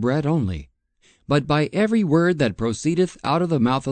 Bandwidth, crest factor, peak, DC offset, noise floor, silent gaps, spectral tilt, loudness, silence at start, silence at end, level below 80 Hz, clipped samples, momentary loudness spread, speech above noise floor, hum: 9.2 kHz; 16 dB; -6 dBFS; under 0.1%; -60 dBFS; none; -6.5 dB/octave; -21 LUFS; 0 s; 0 s; -46 dBFS; under 0.1%; 5 LU; 40 dB; none